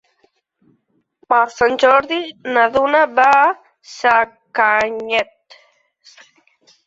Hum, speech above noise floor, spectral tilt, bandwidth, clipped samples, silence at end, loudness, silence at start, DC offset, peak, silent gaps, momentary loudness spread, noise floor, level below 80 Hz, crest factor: none; 49 dB; -3 dB/octave; 8 kHz; under 0.1%; 1.65 s; -15 LUFS; 1.3 s; under 0.1%; 0 dBFS; none; 11 LU; -64 dBFS; -58 dBFS; 18 dB